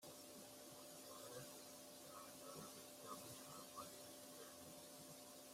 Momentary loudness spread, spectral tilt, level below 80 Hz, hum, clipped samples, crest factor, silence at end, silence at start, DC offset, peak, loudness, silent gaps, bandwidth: 3 LU; -2.5 dB/octave; -88 dBFS; none; under 0.1%; 16 dB; 0 s; 0 s; under 0.1%; -42 dBFS; -57 LUFS; none; 16 kHz